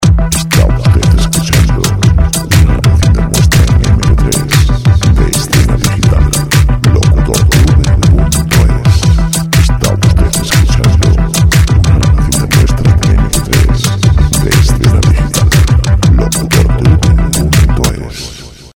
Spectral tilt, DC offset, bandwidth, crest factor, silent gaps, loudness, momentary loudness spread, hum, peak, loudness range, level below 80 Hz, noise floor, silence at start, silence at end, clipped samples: -5 dB/octave; under 0.1%; 19.5 kHz; 8 dB; none; -9 LUFS; 3 LU; none; 0 dBFS; 1 LU; -12 dBFS; -27 dBFS; 0 s; 0.15 s; 1%